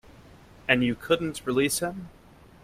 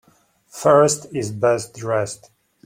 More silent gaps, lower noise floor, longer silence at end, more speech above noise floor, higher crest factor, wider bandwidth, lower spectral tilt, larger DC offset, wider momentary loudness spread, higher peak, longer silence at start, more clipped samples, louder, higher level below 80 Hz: neither; second, -51 dBFS vs -58 dBFS; about the same, 0.55 s vs 0.5 s; second, 25 dB vs 39 dB; about the same, 22 dB vs 18 dB; about the same, 16 kHz vs 16.5 kHz; about the same, -4 dB/octave vs -4.5 dB/octave; neither; about the same, 15 LU vs 16 LU; second, -6 dBFS vs -2 dBFS; second, 0.1 s vs 0.55 s; neither; second, -26 LUFS vs -19 LUFS; about the same, -56 dBFS vs -60 dBFS